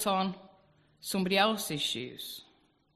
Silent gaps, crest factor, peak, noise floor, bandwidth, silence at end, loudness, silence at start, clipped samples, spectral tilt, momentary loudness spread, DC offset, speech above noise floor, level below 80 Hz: none; 22 dB; -10 dBFS; -65 dBFS; 14 kHz; 0.55 s; -31 LUFS; 0 s; under 0.1%; -3.5 dB/octave; 17 LU; under 0.1%; 33 dB; -70 dBFS